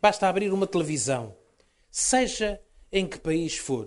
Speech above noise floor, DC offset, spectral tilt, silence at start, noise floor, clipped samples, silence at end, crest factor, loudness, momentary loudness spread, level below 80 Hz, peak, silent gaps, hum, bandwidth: 38 dB; under 0.1%; -3.5 dB/octave; 0.05 s; -63 dBFS; under 0.1%; 0 s; 18 dB; -26 LUFS; 9 LU; -50 dBFS; -8 dBFS; none; none; 11.5 kHz